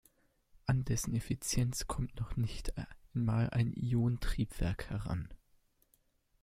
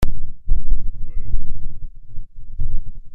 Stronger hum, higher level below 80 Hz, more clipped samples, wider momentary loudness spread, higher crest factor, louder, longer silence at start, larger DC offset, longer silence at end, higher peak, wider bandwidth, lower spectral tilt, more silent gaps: neither; second, -46 dBFS vs -20 dBFS; neither; second, 9 LU vs 14 LU; first, 16 dB vs 10 dB; second, -36 LUFS vs -32 LUFS; first, 0.65 s vs 0 s; neither; first, 1.05 s vs 0 s; second, -20 dBFS vs -2 dBFS; first, 15.5 kHz vs 1.3 kHz; second, -5.5 dB/octave vs -7 dB/octave; neither